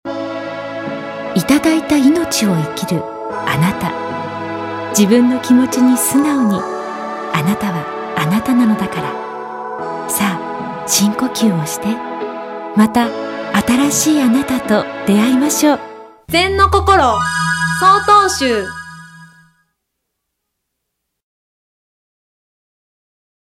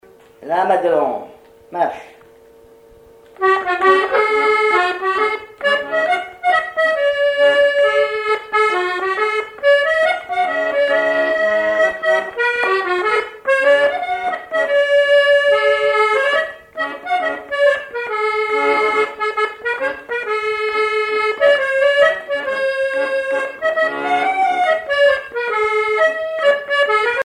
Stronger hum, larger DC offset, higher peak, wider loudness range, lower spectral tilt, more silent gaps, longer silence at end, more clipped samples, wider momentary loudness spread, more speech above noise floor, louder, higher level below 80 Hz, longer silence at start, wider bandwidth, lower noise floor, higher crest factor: neither; neither; about the same, 0 dBFS vs 0 dBFS; about the same, 5 LU vs 3 LU; first, -4.5 dB/octave vs -2.5 dB/octave; neither; first, 4.3 s vs 0 s; neither; first, 13 LU vs 7 LU; first, 61 dB vs 29 dB; about the same, -15 LUFS vs -16 LUFS; first, -40 dBFS vs -58 dBFS; second, 0.05 s vs 0.4 s; first, 16 kHz vs 11.5 kHz; first, -75 dBFS vs -45 dBFS; about the same, 16 dB vs 16 dB